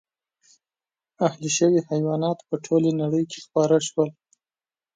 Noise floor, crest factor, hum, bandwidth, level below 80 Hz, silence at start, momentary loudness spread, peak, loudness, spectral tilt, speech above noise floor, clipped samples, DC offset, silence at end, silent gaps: under -90 dBFS; 18 dB; none; 9.4 kHz; -70 dBFS; 1.2 s; 6 LU; -6 dBFS; -23 LUFS; -5.5 dB/octave; over 68 dB; under 0.1%; under 0.1%; 0.85 s; none